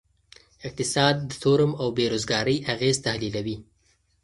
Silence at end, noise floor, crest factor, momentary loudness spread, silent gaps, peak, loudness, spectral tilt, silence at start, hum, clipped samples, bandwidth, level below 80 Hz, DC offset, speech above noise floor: 0.6 s; -66 dBFS; 22 dB; 12 LU; none; -4 dBFS; -24 LUFS; -4.5 dB/octave; 0.6 s; none; under 0.1%; 11.5 kHz; -54 dBFS; under 0.1%; 42 dB